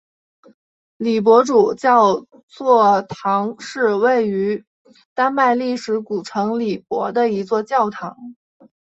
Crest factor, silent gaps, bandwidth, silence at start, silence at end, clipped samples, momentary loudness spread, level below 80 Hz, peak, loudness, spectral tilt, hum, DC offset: 16 dB; 2.43-2.48 s, 4.67-4.85 s, 5.05-5.16 s; 8 kHz; 1 s; 0.5 s; under 0.1%; 12 LU; -64 dBFS; -2 dBFS; -18 LUFS; -5.5 dB/octave; none; under 0.1%